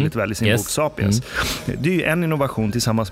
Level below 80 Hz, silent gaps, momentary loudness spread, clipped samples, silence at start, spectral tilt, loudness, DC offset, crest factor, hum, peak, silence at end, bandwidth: -40 dBFS; none; 4 LU; under 0.1%; 0 s; -5 dB/octave; -20 LUFS; under 0.1%; 18 dB; none; -2 dBFS; 0 s; 16 kHz